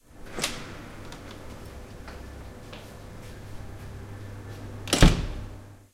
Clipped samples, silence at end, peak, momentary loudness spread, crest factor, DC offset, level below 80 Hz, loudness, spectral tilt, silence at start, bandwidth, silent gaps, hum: under 0.1%; 0.1 s; 0 dBFS; 22 LU; 30 dB; under 0.1%; -34 dBFS; -28 LUFS; -4.5 dB/octave; 0.1 s; 16.5 kHz; none; none